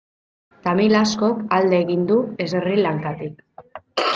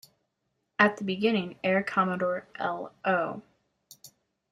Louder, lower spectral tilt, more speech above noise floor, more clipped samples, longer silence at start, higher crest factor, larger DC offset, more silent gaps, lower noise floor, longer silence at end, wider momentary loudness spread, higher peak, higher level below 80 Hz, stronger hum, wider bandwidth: first, -20 LUFS vs -28 LUFS; about the same, -5.5 dB/octave vs -6 dB/octave; second, 23 dB vs 51 dB; neither; second, 0.65 s vs 0.8 s; second, 16 dB vs 26 dB; neither; neither; second, -42 dBFS vs -79 dBFS; second, 0 s vs 0.45 s; first, 12 LU vs 9 LU; about the same, -4 dBFS vs -4 dBFS; first, -60 dBFS vs -72 dBFS; neither; second, 7.6 kHz vs 14.5 kHz